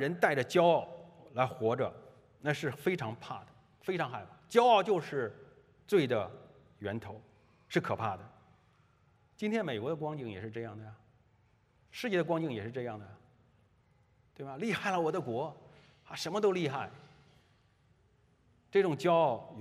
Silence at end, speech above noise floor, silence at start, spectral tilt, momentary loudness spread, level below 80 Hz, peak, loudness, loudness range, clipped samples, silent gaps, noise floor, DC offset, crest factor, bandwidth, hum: 0 s; 36 dB; 0 s; -6 dB/octave; 18 LU; -76 dBFS; -12 dBFS; -33 LUFS; 7 LU; under 0.1%; none; -69 dBFS; under 0.1%; 22 dB; 15.5 kHz; none